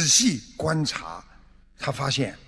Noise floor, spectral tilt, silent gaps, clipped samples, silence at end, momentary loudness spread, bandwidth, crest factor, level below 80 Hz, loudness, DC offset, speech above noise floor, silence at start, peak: -52 dBFS; -3 dB/octave; none; under 0.1%; 0.1 s; 17 LU; 11 kHz; 20 dB; -52 dBFS; -24 LUFS; under 0.1%; 27 dB; 0 s; -6 dBFS